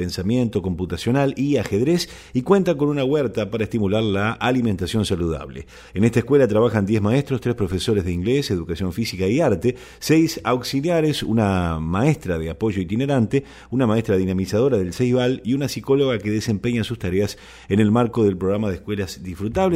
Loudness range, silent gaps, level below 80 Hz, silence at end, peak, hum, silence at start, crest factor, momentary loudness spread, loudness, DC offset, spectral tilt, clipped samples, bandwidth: 1 LU; none; -44 dBFS; 0 s; -2 dBFS; none; 0 s; 18 dB; 8 LU; -21 LUFS; under 0.1%; -6.5 dB/octave; under 0.1%; 16 kHz